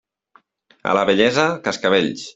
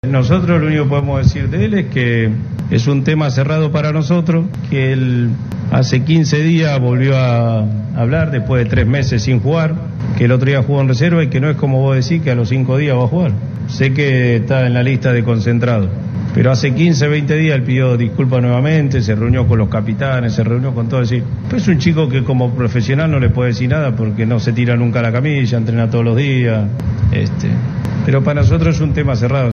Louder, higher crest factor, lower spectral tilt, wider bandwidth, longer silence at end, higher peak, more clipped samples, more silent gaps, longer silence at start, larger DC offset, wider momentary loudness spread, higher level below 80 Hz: second, -18 LUFS vs -14 LUFS; about the same, 18 dB vs 14 dB; second, -4.5 dB/octave vs -7.5 dB/octave; first, 8 kHz vs 6.8 kHz; about the same, 0.05 s vs 0 s; about the same, -2 dBFS vs 0 dBFS; neither; neither; first, 0.85 s vs 0.05 s; neither; about the same, 6 LU vs 4 LU; second, -58 dBFS vs -34 dBFS